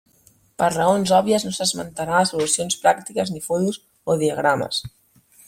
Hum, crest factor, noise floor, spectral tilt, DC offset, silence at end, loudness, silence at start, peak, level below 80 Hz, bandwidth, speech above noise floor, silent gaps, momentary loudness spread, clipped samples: none; 20 dB; -57 dBFS; -3.5 dB/octave; under 0.1%; 0.6 s; -21 LUFS; 0.6 s; -2 dBFS; -58 dBFS; 16.5 kHz; 37 dB; none; 8 LU; under 0.1%